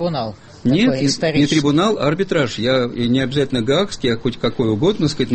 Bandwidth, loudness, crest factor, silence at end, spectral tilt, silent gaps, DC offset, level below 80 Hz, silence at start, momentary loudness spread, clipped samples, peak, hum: 8.8 kHz; -18 LUFS; 14 dB; 0 s; -5.5 dB/octave; none; under 0.1%; -44 dBFS; 0 s; 5 LU; under 0.1%; -4 dBFS; none